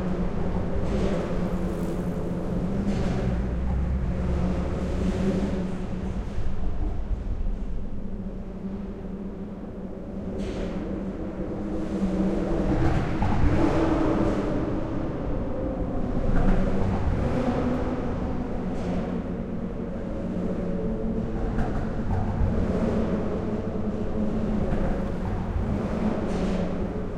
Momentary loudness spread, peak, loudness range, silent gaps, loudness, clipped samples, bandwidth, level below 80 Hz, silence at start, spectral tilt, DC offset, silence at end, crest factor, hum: 8 LU; -10 dBFS; 8 LU; none; -28 LUFS; under 0.1%; 9 kHz; -32 dBFS; 0 s; -8.5 dB/octave; under 0.1%; 0 s; 16 dB; none